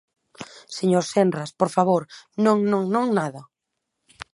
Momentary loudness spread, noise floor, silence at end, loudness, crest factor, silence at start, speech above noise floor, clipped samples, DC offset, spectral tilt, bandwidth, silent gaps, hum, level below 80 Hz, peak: 20 LU; -80 dBFS; 0.1 s; -22 LUFS; 20 dB; 0.4 s; 59 dB; under 0.1%; under 0.1%; -6 dB/octave; 11.5 kHz; none; none; -68 dBFS; -4 dBFS